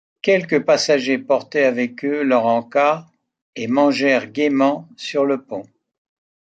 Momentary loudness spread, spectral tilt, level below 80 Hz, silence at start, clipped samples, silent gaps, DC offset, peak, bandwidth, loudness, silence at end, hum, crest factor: 10 LU; -4.5 dB/octave; -70 dBFS; 0.25 s; under 0.1%; 3.42-3.53 s; under 0.1%; -4 dBFS; 9 kHz; -18 LUFS; 0.95 s; none; 16 dB